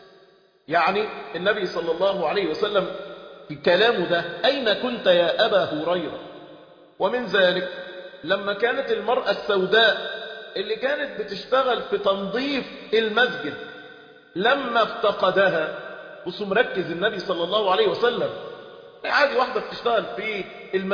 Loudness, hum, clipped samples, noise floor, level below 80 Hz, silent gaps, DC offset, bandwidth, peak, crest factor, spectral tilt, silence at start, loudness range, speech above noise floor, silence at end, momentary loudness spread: -22 LUFS; none; under 0.1%; -56 dBFS; -62 dBFS; none; under 0.1%; 5.2 kHz; -6 dBFS; 18 dB; -5.5 dB/octave; 0.7 s; 3 LU; 33 dB; 0 s; 15 LU